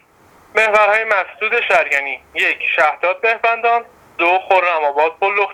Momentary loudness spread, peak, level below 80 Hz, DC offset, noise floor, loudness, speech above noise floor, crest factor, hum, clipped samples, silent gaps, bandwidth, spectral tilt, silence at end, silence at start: 5 LU; 0 dBFS; -60 dBFS; under 0.1%; -49 dBFS; -15 LUFS; 33 dB; 16 dB; none; under 0.1%; none; 14.5 kHz; -2 dB/octave; 0 s; 0.55 s